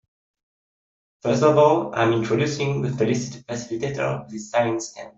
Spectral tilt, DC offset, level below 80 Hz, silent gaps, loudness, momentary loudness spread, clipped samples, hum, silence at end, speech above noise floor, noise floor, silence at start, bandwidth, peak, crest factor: -6 dB/octave; under 0.1%; -58 dBFS; none; -22 LUFS; 13 LU; under 0.1%; none; 0.1 s; over 68 dB; under -90 dBFS; 1.25 s; 8 kHz; -4 dBFS; 20 dB